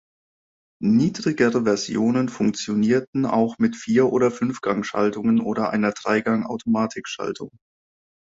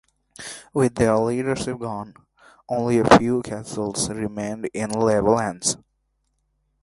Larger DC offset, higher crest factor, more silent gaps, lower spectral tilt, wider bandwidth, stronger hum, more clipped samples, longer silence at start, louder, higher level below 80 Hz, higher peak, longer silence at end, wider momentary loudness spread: neither; second, 16 dB vs 22 dB; first, 3.08-3.13 s vs none; about the same, -6 dB/octave vs -5 dB/octave; second, 7.8 kHz vs 11.5 kHz; neither; neither; first, 0.8 s vs 0.4 s; about the same, -22 LUFS vs -22 LUFS; second, -60 dBFS vs -48 dBFS; second, -6 dBFS vs 0 dBFS; second, 0.8 s vs 1.05 s; second, 7 LU vs 16 LU